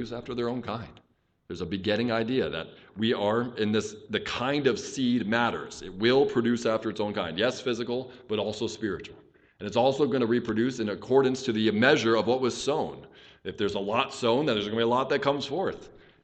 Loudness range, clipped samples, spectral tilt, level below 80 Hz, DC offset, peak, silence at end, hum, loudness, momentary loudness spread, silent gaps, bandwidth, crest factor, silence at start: 5 LU; under 0.1%; -5 dB/octave; -60 dBFS; under 0.1%; -6 dBFS; 0.3 s; none; -27 LUFS; 13 LU; none; 9 kHz; 22 dB; 0 s